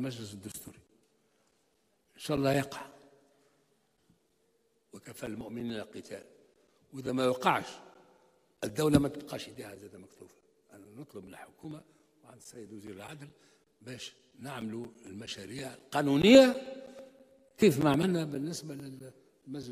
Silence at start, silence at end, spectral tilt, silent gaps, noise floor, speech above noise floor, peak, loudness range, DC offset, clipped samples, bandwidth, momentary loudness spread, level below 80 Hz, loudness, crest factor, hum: 0 s; 0 s; -5.5 dB/octave; none; -74 dBFS; 43 dB; -8 dBFS; 22 LU; under 0.1%; under 0.1%; 15.5 kHz; 23 LU; -62 dBFS; -29 LUFS; 26 dB; none